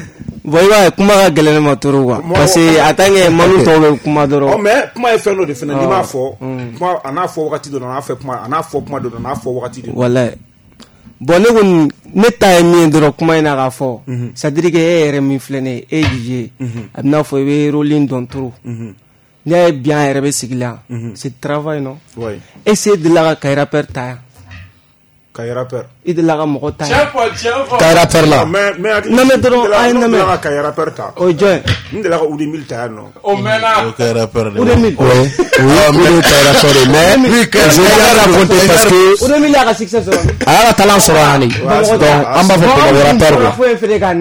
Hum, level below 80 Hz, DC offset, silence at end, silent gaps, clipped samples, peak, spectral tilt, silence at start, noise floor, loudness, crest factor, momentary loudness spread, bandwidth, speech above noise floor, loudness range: none; -34 dBFS; under 0.1%; 0 s; none; under 0.1%; 0 dBFS; -4.5 dB/octave; 0 s; -50 dBFS; -10 LUFS; 10 dB; 15 LU; over 20 kHz; 40 dB; 10 LU